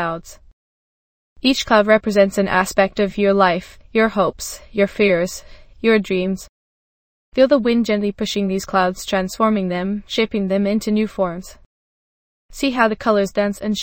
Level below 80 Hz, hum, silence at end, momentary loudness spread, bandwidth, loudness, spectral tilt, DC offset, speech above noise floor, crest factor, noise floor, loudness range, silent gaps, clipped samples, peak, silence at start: -46 dBFS; none; 0 s; 9 LU; 17 kHz; -18 LUFS; -5 dB/octave; under 0.1%; over 72 dB; 18 dB; under -90 dBFS; 4 LU; 0.53-1.36 s, 6.49-7.32 s, 11.66-12.49 s; under 0.1%; 0 dBFS; 0 s